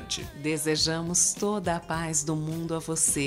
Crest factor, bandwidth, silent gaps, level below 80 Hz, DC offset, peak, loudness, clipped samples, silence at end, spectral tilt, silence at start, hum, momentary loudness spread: 18 dB; 16 kHz; none; -50 dBFS; under 0.1%; -10 dBFS; -27 LUFS; under 0.1%; 0 s; -3 dB/octave; 0 s; none; 8 LU